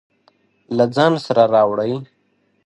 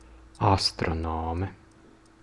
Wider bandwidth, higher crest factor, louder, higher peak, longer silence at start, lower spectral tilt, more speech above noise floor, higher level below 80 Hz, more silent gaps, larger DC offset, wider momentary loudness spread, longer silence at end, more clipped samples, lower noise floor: about the same, 11 kHz vs 12 kHz; about the same, 18 dB vs 22 dB; first, -17 LUFS vs -27 LUFS; first, 0 dBFS vs -8 dBFS; first, 0.7 s vs 0.1 s; first, -6.5 dB/octave vs -5 dB/octave; first, 48 dB vs 28 dB; second, -64 dBFS vs -46 dBFS; neither; neither; about the same, 11 LU vs 10 LU; about the same, 0.6 s vs 0.7 s; neither; first, -63 dBFS vs -55 dBFS